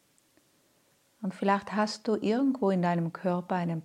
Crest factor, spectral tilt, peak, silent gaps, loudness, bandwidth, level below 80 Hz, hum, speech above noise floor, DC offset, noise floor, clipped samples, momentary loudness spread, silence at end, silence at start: 18 dB; -7 dB/octave; -12 dBFS; none; -29 LUFS; 11 kHz; -78 dBFS; none; 39 dB; under 0.1%; -68 dBFS; under 0.1%; 5 LU; 0.05 s; 1.2 s